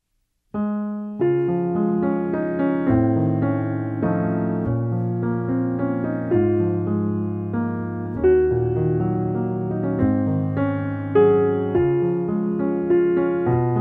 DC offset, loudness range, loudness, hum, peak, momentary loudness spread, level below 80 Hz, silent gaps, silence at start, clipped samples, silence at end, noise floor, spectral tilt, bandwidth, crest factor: under 0.1%; 2 LU; -21 LUFS; none; -6 dBFS; 7 LU; -46 dBFS; none; 0.55 s; under 0.1%; 0 s; -70 dBFS; -12 dB/octave; 3.6 kHz; 14 dB